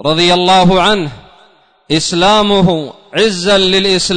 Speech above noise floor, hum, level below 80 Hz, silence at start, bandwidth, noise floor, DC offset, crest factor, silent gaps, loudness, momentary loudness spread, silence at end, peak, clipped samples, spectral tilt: 37 dB; none; -36 dBFS; 0 s; 9.6 kHz; -48 dBFS; under 0.1%; 10 dB; none; -10 LUFS; 8 LU; 0 s; -2 dBFS; under 0.1%; -4 dB/octave